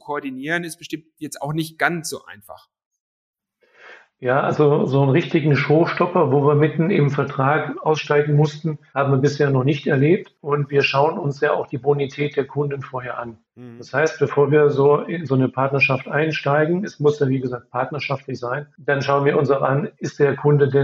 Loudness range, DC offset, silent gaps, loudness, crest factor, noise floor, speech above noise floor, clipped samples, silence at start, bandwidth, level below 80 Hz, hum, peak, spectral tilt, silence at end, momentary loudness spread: 6 LU; under 0.1%; 2.86-2.91 s, 3.00-3.34 s; -19 LUFS; 18 dB; -55 dBFS; 36 dB; under 0.1%; 0.05 s; 13.5 kHz; -66 dBFS; none; -2 dBFS; -7 dB/octave; 0 s; 11 LU